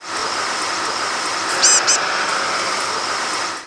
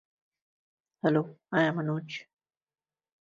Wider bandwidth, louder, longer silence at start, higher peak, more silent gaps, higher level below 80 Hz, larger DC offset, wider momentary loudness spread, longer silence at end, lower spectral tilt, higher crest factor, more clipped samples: first, 11 kHz vs 7.6 kHz; first, -17 LUFS vs -29 LUFS; second, 0 s vs 1.05 s; first, -2 dBFS vs -12 dBFS; neither; first, -64 dBFS vs -76 dBFS; neither; second, 8 LU vs 12 LU; second, 0 s vs 1 s; second, 1 dB/octave vs -7.5 dB/octave; about the same, 18 dB vs 22 dB; neither